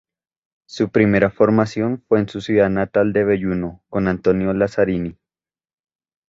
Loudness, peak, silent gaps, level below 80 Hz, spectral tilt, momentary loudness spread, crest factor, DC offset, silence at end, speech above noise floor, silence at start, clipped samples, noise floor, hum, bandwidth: -18 LUFS; -2 dBFS; none; -46 dBFS; -8 dB/octave; 9 LU; 18 dB; under 0.1%; 1.15 s; over 72 dB; 0.7 s; under 0.1%; under -90 dBFS; none; 7.8 kHz